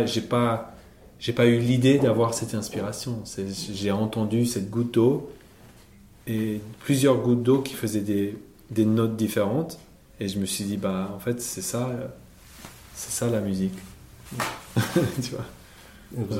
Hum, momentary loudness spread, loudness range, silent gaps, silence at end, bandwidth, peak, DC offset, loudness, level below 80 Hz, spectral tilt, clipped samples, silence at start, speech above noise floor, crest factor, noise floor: none; 18 LU; 6 LU; none; 0 s; 16.5 kHz; -6 dBFS; under 0.1%; -25 LUFS; -54 dBFS; -5.5 dB/octave; under 0.1%; 0 s; 27 dB; 20 dB; -51 dBFS